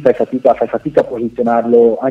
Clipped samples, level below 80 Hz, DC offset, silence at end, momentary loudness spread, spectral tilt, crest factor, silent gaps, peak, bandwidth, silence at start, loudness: 0.1%; -50 dBFS; under 0.1%; 0 s; 6 LU; -8.5 dB/octave; 12 dB; none; 0 dBFS; 5 kHz; 0 s; -14 LUFS